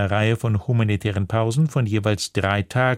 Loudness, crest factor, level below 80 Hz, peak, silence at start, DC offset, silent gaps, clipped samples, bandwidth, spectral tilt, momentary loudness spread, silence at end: -21 LUFS; 16 dB; -50 dBFS; -4 dBFS; 0 s; under 0.1%; none; under 0.1%; 13.5 kHz; -6 dB/octave; 2 LU; 0 s